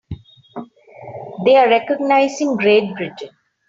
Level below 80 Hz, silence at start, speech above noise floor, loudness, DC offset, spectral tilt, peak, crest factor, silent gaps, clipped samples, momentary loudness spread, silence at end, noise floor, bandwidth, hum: -54 dBFS; 0.1 s; 23 dB; -15 LUFS; under 0.1%; -5 dB/octave; -2 dBFS; 16 dB; none; under 0.1%; 23 LU; 0.4 s; -38 dBFS; 7.8 kHz; none